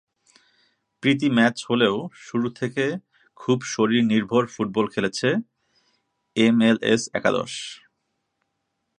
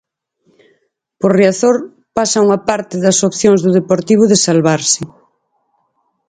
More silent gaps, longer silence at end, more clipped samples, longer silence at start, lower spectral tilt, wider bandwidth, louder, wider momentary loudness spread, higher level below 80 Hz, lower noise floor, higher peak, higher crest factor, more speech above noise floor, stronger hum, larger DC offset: neither; about the same, 1.25 s vs 1.25 s; neither; second, 1.05 s vs 1.2 s; about the same, -5 dB/octave vs -4.5 dB/octave; about the same, 10 kHz vs 9.6 kHz; second, -22 LUFS vs -12 LUFS; first, 11 LU vs 8 LU; second, -66 dBFS vs -54 dBFS; first, -77 dBFS vs -64 dBFS; about the same, -2 dBFS vs 0 dBFS; first, 20 dB vs 14 dB; about the same, 55 dB vs 52 dB; neither; neither